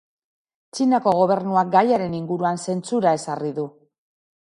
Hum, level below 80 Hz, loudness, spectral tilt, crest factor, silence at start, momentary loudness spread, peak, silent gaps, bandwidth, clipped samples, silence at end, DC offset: none; -66 dBFS; -21 LUFS; -6 dB/octave; 20 dB; 0.75 s; 10 LU; -2 dBFS; none; 11.5 kHz; under 0.1%; 0.85 s; under 0.1%